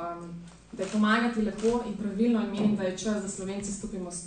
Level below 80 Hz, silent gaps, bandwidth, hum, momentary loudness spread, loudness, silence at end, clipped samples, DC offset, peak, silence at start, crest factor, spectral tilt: -54 dBFS; none; 9.6 kHz; none; 13 LU; -29 LUFS; 0 s; under 0.1%; under 0.1%; -12 dBFS; 0 s; 16 dB; -5 dB/octave